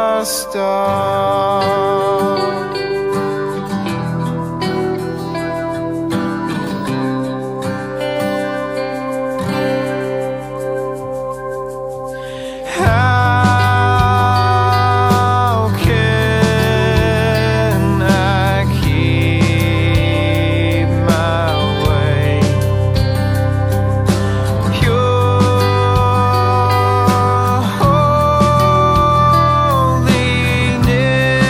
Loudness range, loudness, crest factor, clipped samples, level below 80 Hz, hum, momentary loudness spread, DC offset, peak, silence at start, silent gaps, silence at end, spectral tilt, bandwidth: 8 LU; -15 LUFS; 14 dB; under 0.1%; -30 dBFS; none; 9 LU; under 0.1%; 0 dBFS; 0 s; none; 0 s; -6 dB/octave; 16 kHz